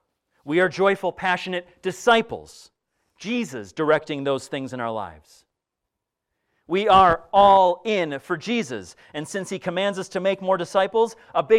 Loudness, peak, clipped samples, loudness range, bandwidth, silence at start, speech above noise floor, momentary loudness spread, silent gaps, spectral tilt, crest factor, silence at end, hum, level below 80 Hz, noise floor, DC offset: -22 LUFS; -4 dBFS; under 0.1%; 8 LU; 13.5 kHz; 0.45 s; 61 dB; 16 LU; none; -4.5 dB/octave; 18 dB; 0 s; none; -54 dBFS; -83 dBFS; under 0.1%